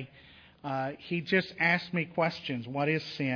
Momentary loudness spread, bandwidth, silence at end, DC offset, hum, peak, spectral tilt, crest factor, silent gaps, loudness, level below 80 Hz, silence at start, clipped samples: 10 LU; 5.4 kHz; 0 s; under 0.1%; none; -12 dBFS; -7 dB/octave; 20 dB; none; -30 LUFS; -70 dBFS; 0 s; under 0.1%